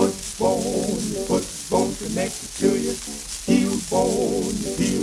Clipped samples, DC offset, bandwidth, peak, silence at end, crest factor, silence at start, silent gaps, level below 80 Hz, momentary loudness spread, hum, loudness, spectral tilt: under 0.1%; under 0.1%; 16 kHz; -6 dBFS; 0 s; 16 dB; 0 s; none; -44 dBFS; 6 LU; none; -23 LUFS; -4.5 dB/octave